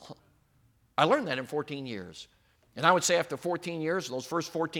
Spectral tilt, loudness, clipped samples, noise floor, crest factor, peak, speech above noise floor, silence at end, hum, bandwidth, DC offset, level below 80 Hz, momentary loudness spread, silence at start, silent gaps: -3.5 dB/octave; -29 LUFS; under 0.1%; -66 dBFS; 24 dB; -6 dBFS; 37 dB; 0 s; none; 17.5 kHz; under 0.1%; -72 dBFS; 15 LU; 0 s; none